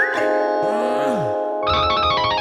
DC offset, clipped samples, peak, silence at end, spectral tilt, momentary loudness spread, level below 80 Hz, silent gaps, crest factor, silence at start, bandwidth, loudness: under 0.1%; under 0.1%; -6 dBFS; 0 s; -5 dB/octave; 4 LU; -42 dBFS; none; 12 dB; 0 s; 12.5 kHz; -19 LUFS